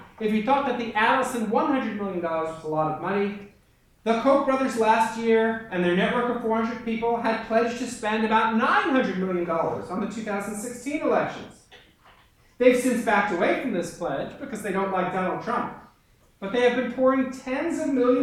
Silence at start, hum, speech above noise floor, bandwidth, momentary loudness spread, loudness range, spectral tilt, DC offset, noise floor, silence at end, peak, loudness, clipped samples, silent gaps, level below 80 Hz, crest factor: 0 s; none; 36 dB; 14.5 kHz; 9 LU; 4 LU; -5.5 dB/octave; under 0.1%; -60 dBFS; 0 s; -4 dBFS; -24 LUFS; under 0.1%; none; -58 dBFS; 20 dB